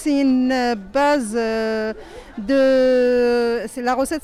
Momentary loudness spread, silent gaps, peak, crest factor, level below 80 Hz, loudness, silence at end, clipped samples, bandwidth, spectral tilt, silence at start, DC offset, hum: 10 LU; none; -10 dBFS; 8 dB; -46 dBFS; -19 LUFS; 0.05 s; under 0.1%; 14 kHz; -4.5 dB/octave; 0 s; under 0.1%; none